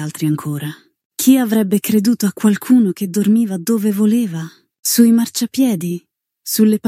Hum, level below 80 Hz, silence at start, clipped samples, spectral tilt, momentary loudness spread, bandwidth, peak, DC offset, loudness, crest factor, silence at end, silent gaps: none; -68 dBFS; 0 s; under 0.1%; -5 dB/octave; 13 LU; 16.5 kHz; 0 dBFS; under 0.1%; -16 LUFS; 14 dB; 0 s; 1.05-1.10 s, 4.79-4.83 s